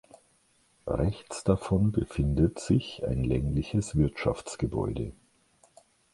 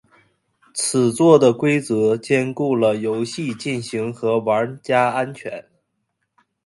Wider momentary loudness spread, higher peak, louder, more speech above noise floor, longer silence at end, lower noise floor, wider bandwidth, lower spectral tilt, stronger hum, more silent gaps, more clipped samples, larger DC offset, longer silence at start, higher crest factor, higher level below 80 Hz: second, 7 LU vs 12 LU; second, -10 dBFS vs 0 dBFS; second, -29 LUFS vs -19 LUFS; second, 39 dB vs 55 dB; about the same, 1 s vs 1.05 s; second, -67 dBFS vs -74 dBFS; about the same, 11.5 kHz vs 11.5 kHz; first, -7 dB/octave vs -5 dB/octave; neither; neither; neither; neither; about the same, 0.85 s vs 0.75 s; about the same, 20 dB vs 20 dB; first, -40 dBFS vs -64 dBFS